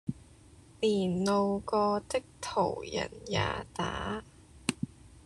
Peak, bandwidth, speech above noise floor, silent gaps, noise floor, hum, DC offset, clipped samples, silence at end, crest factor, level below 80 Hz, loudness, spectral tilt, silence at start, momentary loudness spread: -8 dBFS; 12.5 kHz; 25 dB; none; -56 dBFS; none; under 0.1%; under 0.1%; 0.05 s; 24 dB; -54 dBFS; -32 LUFS; -5 dB/octave; 0.05 s; 11 LU